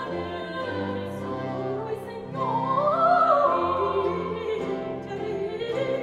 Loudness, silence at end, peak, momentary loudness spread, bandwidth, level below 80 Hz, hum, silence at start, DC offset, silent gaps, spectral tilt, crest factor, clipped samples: -26 LUFS; 0 s; -8 dBFS; 12 LU; 12.5 kHz; -58 dBFS; none; 0 s; under 0.1%; none; -7 dB/octave; 18 dB; under 0.1%